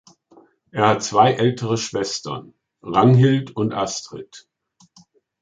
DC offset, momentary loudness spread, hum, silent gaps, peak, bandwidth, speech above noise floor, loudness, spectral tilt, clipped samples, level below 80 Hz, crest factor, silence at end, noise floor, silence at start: under 0.1%; 18 LU; none; none; -2 dBFS; 9.2 kHz; 37 dB; -19 LUFS; -5.5 dB/octave; under 0.1%; -58 dBFS; 18 dB; 1 s; -56 dBFS; 0.75 s